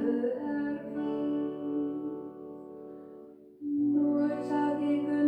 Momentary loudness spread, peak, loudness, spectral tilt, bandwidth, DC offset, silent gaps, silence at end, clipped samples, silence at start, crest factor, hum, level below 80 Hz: 18 LU; -16 dBFS; -31 LUFS; -8.5 dB/octave; 5 kHz; under 0.1%; none; 0 s; under 0.1%; 0 s; 14 dB; none; -74 dBFS